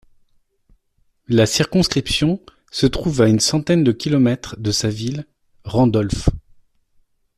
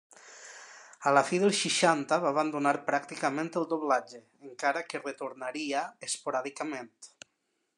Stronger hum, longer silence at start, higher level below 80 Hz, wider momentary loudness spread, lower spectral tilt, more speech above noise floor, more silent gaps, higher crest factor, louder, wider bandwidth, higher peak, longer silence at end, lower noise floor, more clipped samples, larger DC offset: neither; first, 1.3 s vs 0.25 s; first, -36 dBFS vs -88 dBFS; second, 11 LU vs 23 LU; first, -5 dB/octave vs -3.5 dB/octave; about the same, 46 dB vs 49 dB; neither; second, 16 dB vs 22 dB; first, -18 LUFS vs -30 LUFS; first, 14 kHz vs 12.5 kHz; first, -2 dBFS vs -10 dBFS; first, 1 s vs 0.7 s; second, -63 dBFS vs -79 dBFS; neither; neither